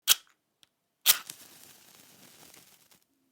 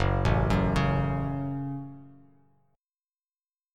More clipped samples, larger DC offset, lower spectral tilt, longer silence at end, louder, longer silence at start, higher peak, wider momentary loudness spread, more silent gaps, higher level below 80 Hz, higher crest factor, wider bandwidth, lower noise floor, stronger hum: neither; neither; second, 3 dB/octave vs -7.5 dB/octave; first, 2.1 s vs 1.65 s; first, -25 LUFS vs -28 LUFS; about the same, 0.05 s vs 0 s; first, 0 dBFS vs -10 dBFS; first, 25 LU vs 12 LU; neither; second, -78 dBFS vs -38 dBFS; first, 34 dB vs 20 dB; first, over 20 kHz vs 10.5 kHz; second, -69 dBFS vs under -90 dBFS; neither